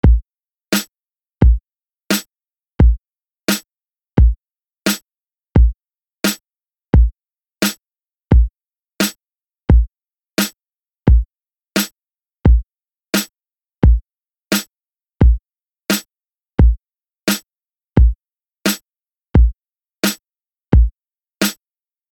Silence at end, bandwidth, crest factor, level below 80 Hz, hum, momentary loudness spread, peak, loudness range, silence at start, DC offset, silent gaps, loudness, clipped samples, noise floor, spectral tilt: 0.6 s; 19 kHz; 14 dB; -18 dBFS; none; 10 LU; -2 dBFS; 1 LU; 0.05 s; under 0.1%; none; -18 LUFS; under 0.1%; under -90 dBFS; -5 dB/octave